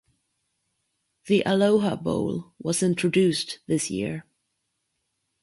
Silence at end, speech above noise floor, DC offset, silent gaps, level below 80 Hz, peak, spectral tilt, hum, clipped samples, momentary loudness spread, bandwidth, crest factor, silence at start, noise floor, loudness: 1.2 s; 54 dB; under 0.1%; none; -60 dBFS; -8 dBFS; -5 dB/octave; none; under 0.1%; 10 LU; 11.5 kHz; 18 dB; 1.25 s; -77 dBFS; -24 LUFS